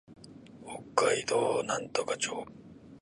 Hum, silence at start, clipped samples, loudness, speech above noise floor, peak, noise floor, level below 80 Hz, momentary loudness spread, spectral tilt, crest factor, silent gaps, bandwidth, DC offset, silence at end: none; 0.1 s; under 0.1%; -31 LUFS; 20 dB; -10 dBFS; -51 dBFS; -68 dBFS; 23 LU; -2.5 dB/octave; 24 dB; none; 11.5 kHz; under 0.1%; 0.05 s